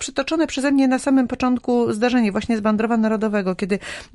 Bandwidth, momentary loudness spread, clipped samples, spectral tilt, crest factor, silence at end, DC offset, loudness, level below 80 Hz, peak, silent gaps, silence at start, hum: 11.5 kHz; 5 LU; under 0.1%; -5 dB/octave; 12 dB; 0.1 s; under 0.1%; -20 LUFS; -50 dBFS; -6 dBFS; none; 0 s; none